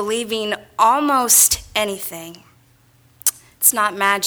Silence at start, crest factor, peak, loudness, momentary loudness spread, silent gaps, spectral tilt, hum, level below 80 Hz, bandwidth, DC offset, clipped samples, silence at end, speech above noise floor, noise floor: 0 s; 20 dB; 0 dBFS; -16 LUFS; 13 LU; none; -0.5 dB/octave; none; -50 dBFS; over 20 kHz; under 0.1%; under 0.1%; 0 s; 36 dB; -54 dBFS